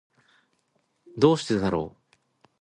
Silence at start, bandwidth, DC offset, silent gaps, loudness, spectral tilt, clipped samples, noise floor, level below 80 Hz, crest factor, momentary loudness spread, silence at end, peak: 1.15 s; 10.5 kHz; under 0.1%; none; -24 LUFS; -6.5 dB/octave; under 0.1%; -72 dBFS; -54 dBFS; 24 dB; 17 LU; 0.7 s; -4 dBFS